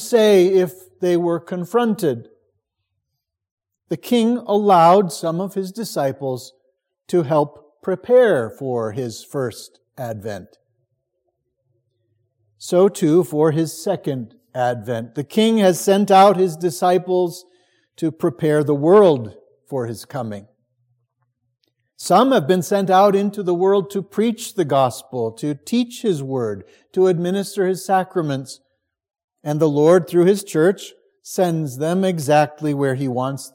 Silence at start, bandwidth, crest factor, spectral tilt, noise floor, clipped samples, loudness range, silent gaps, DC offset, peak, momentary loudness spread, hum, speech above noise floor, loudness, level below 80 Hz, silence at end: 0 s; 17 kHz; 18 dB; -6 dB/octave; -79 dBFS; under 0.1%; 6 LU; 3.51-3.57 s, 29.24-29.28 s; under 0.1%; -2 dBFS; 15 LU; none; 61 dB; -18 LUFS; -70 dBFS; 0.05 s